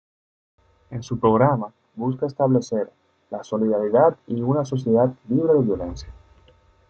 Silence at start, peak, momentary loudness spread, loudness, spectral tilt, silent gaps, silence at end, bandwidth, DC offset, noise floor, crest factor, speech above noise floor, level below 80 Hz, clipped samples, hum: 0.9 s; -4 dBFS; 17 LU; -21 LUFS; -8.5 dB/octave; none; 0.75 s; 7.4 kHz; under 0.1%; -56 dBFS; 18 dB; 35 dB; -50 dBFS; under 0.1%; none